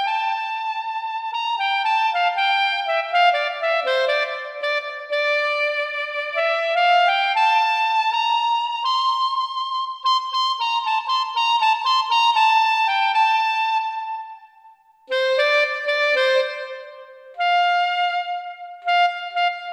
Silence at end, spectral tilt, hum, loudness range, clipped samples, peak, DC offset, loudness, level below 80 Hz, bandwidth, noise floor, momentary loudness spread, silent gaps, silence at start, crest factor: 0 s; 3.5 dB/octave; none; 3 LU; under 0.1%; -6 dBFS; under 0.1%; -20 LUFS; -76 dBFS; 13 kHz; -51 dBFS; 9 LU; none; 0 s; 14 dB